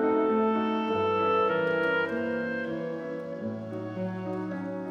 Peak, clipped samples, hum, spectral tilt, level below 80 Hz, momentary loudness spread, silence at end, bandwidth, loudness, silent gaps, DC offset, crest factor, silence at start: -16 dBFS; under 0.1%; none; -7.5 dB/octave; -72 dBFS; 10 LU; 0 s; 7 kHz; -29 LUFS; none; under 0.1%; 12 dB; 0 s